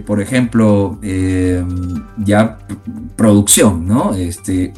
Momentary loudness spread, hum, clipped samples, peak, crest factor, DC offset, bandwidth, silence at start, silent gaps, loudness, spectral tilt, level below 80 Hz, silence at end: 14 LU; none; under 0.1%; 0 dBFS; 14 dB; 0.1%; 19 kHz; 0 s; none; -14 LUFS; -5 dB/octave; -36 dBFS; 0 s